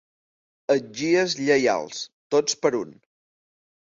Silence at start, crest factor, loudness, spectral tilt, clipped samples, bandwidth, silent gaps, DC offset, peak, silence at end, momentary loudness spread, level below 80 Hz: 0.7 s; 18 dB; -23 LUFS; -3.5 dB/octave; under 0.1%; 7.8 kHz; 2.13-2.30 s; under 0.1%; -6 dBFS; 1.1 s; 14 LU; -68 dBFS